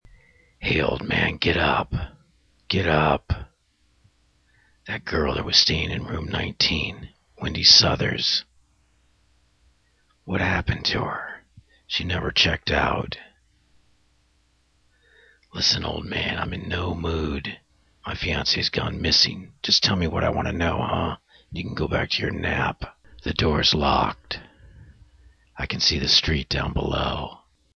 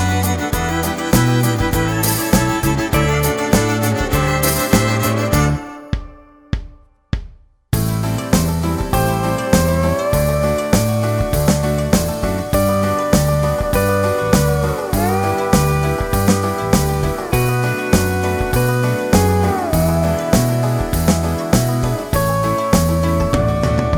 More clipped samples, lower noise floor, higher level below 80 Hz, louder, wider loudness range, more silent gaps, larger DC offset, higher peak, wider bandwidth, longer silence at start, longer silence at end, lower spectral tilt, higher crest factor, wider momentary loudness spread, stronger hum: neither; first, -64 dBFS vs -40 dBFS; second, -38 dBFS vs -28 dBFS; second, -22 LUFS vs -17 LUFS; first, 8 LU vs 3 LU; neither; neither; about the same, 0 dBFS vs 0 dBFS; second, 6.8 kHz vs over 20 kHz; first, 0.6 s vs 0 s; first, 0.4 s vs 0 s; second, -4 dB/octave vs -5.5 dB/octave; first, 24 dB vs 16 dB; first, 16 LU vs 4 LU; neither